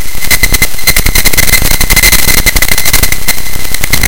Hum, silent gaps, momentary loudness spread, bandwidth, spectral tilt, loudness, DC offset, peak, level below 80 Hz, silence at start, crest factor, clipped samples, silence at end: none; none; 8 LU; over 20 kHz; -1.5 dB/octave; -7 LUFS; 40%; 0 dBFS; -14 dBFS; 0 s; 10 dB; 6%; 0 s